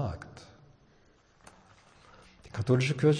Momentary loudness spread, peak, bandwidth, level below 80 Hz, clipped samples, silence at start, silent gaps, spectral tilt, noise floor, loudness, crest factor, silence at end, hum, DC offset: 28 LU; -12 dBFS; 10 kHz; -58 dBFS; under 0.1%; 0 s; none; -7 dB/octave; -63 dBFS; -30 LUFS; 20 dB; 0 s; none; under 0.1%